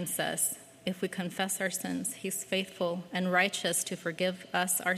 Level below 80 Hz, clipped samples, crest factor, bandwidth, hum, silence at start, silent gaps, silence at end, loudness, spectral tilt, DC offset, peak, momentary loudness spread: -78 dBFS; under 0.1%; 20 dB; 15.5 kHz; none; 0 s; none; 0 s; -31 LUFS; -3 dB/octave; under 0.1%; -12 dBFS; 8 LU